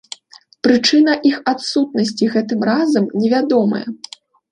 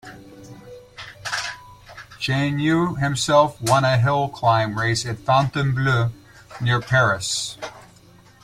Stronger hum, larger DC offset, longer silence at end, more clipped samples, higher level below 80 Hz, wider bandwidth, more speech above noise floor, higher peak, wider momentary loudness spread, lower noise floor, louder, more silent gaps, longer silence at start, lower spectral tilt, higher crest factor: neither; neither; about the same, 0.55 s vs 0.65 s; neither; second, -62 dBFS vs -50 dBFS; second, 10.5 kHz vs 15 kHz; about the same, 32 dB vs 30 dB; about the same, -2 dBFS vs -4 dBFS; second, 17 LU vs 21 LU; about the same, -47 dBFS vs -50 dBFS; first, -16 LUFS vs -20 LUFS; neither; first, 0.65 s vs 0.05 s; about the same, -5 dB/octave vs -5 dB/octave; about the same, 16 dB vs 18 dB